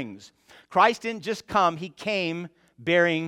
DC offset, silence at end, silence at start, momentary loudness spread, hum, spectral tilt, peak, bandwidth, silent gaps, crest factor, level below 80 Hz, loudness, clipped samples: under 0.1%; 0 s; 0 s; 14 LU; none; -5 dB/octave; -4 dBFS; 14.5 kHz; none; 22 dB; -64 dBFS; -25 LUFS; under 0.1%